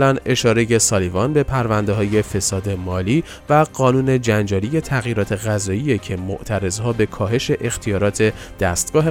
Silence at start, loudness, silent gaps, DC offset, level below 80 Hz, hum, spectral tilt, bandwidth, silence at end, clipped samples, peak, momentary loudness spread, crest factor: 0 s; -19 LUFS; none; under 0.1%; -40 dBFS; none; -5 dB/octave; 17 kHz; 0 s; under 0.1%; -2 dBFS; 6 LU; 16 dB